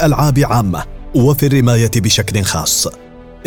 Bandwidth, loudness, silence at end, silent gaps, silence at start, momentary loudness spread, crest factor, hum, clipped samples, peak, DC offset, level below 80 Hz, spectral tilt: 19 kHz; -13 LUFS; 0 s; none; 0 s; 7 LU; 12 dB; none; under 0.1%; 0 dBFS; under 0.1%; -30 dBFS; -4.5 dB/octave